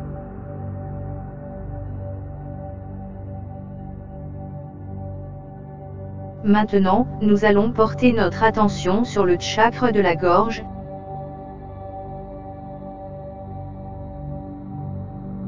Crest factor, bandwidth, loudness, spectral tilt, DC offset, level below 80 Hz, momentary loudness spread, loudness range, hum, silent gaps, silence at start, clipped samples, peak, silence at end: 22 dB; 7.6 kHz; -21 LUFS; -6.5 dB/octave; under 0.1%; -40 dBFS; 18 LU; 16 LU; none; none; 0 s; under 0.1%; -2 dBFS; 0 s